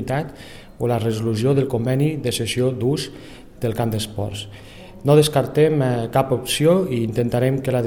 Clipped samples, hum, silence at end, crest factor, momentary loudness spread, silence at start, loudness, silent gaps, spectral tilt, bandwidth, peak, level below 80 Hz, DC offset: under 0.1%; none; 0 s; 18 dB; 16 LU; 0 s; -20 LUFS; none; -6 dB/octave; 18 kHz; -2 dBFS; -46 dBFS; under 0.1%